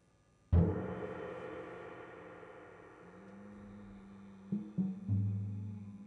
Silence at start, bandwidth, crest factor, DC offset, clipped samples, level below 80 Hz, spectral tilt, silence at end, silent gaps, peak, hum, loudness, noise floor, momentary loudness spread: 0.5 s; 5.6 kHz; 22 dB; under 0.1%; under 0.1%; -54 dBFS; -10 dB/octave; 0 s; none; -16 dBFS; none; -38 LUFS; -69 dBFS; 21 LU